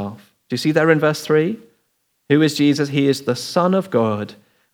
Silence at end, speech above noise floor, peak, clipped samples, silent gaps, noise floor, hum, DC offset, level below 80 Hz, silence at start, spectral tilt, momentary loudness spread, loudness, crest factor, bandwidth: 0.4 s; 50 dB; 0 dBFS; under 0.1%; none; -68 dBFS; none; under 0.1%; -74 dBFS; 0 s; -6 dB/octave; 12 LU; -18 LUFS; 18 dB; 18 kHz